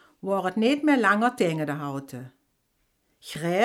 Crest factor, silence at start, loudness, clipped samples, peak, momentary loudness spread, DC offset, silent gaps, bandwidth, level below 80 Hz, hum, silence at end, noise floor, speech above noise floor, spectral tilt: 18 dB; 0.25 s; -24 LUFS; under 0.1%; -8 dBFS; 17 LU; under 0.1%; none; 15.5 kHz; -72 dBFS; none; 0 s; -72 dBFS; 48 dB; -5.5 dB/octave